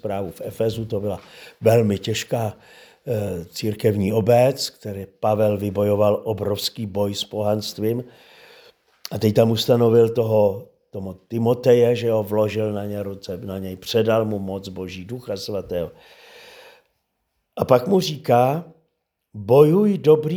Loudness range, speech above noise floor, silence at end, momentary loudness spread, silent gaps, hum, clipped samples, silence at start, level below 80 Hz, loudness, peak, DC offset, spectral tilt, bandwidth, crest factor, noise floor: 7 LU; 54 dB; 0 s; 16 LU; none; none; under 0.1%; 0.05 s; -58 dBFS; -21 LUFS; 0 dBFS; under 0.1%; -6.5 dB/octave; over 20 kHz; 20 dB; -74 dBFS